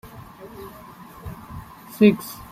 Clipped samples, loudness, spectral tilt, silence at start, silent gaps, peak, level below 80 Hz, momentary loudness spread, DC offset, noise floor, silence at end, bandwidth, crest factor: under 0.1%; -19 LUFS; -6.5 dB/octave; 0.45 s; none; -2 dBFS; -50 dBFS; 25 LU; under 0.1%; -43 dBFS; 0.15 s; 16 kHz; 22 dB